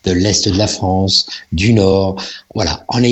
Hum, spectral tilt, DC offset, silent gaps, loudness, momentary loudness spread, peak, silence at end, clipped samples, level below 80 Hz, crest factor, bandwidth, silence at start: none; -4.5 dB/octave; under 0.1%; none; -14 LUFS; 8 LU; 0 dBFS; 0 s; under 0.1%; -36 dBFS; 14 dB; 8.4 kHz; 0.05 s